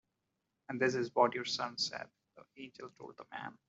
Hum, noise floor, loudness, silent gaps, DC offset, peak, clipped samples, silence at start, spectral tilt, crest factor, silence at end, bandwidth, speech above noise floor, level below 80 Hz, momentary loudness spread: none; -85 dBFS; -35 LUFS; none; under 0.1%; -14 dBFS; under 0.1%; 0.7 s; -3.5 dB/octave; 24 dB; 0.15 s; 8 kHz; 48 dB; -82 dBFS; 20 LU